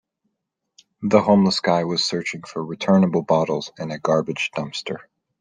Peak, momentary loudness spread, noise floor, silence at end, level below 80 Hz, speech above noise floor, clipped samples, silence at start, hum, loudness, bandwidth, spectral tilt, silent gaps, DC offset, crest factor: -2 dBFS; 13 LU; -79 dBFS; 0.4 s; -62 dBFS; 59 dB; under 0.1%; 1 s; none; -21 LUFS; 9.6 kHz; -5.5 dB/octave; none; under 0.1%; 20 dB